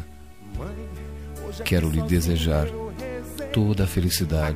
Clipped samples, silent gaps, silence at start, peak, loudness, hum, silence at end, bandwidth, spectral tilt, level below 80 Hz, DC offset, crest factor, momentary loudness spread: under 0.1%; none; 0 s; -8 dBFS; -25 LUFS; none; 0 s; 15.5 kHz; -5.5 dB/octave; -32 dBFS; 0.5%; 16 dB; 14 LU